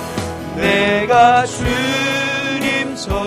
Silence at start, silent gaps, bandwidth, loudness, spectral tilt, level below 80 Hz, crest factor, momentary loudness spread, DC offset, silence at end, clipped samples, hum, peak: 0 s; none; 15.5 kHz; -15 LUFS; -4 dB/octave; -34 dBFS; 14 dB; 11 LU; under 0.1%; 0 s; under 0.1%; none; -2 dBFS